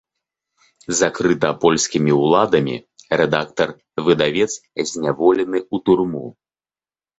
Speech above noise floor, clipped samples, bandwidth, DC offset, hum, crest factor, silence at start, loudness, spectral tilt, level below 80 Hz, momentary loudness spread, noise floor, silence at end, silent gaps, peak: over 72 dB; under 0.1%; 8.2 kHz; under 0.1%; none; 18 dB; 0.9 s; -18 LUFS; -4.5 dB/octave; -54 dBFS; 9 LU; under -90 dBFS; 0.9 s; none; -2 dBFS